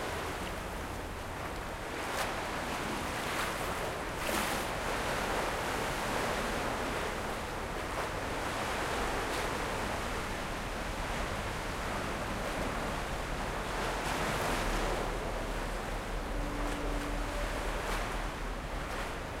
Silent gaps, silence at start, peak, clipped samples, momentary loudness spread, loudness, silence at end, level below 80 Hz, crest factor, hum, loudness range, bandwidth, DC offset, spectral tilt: none; 0 s; -18 dBFS; under 0.1%; 5 LU; -35 LUFS; 0 s; -42 dBFS; 16 dB; none; 3 LU; 16 kHz; under 0.1%; -4 dB/octave